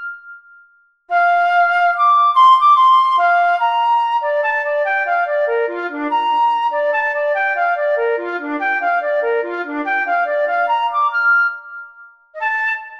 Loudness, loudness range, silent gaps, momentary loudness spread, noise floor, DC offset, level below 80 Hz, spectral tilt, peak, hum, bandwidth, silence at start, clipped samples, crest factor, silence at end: -15 LUFS; 6 LU; none; 10 LU; -52 dBFS; under 0.1%; -70 dBFS; -2 dB/octave; -2 dBFS; none; 7.8 kHz; 0 s; under 0.1%; 14 dB; 0 s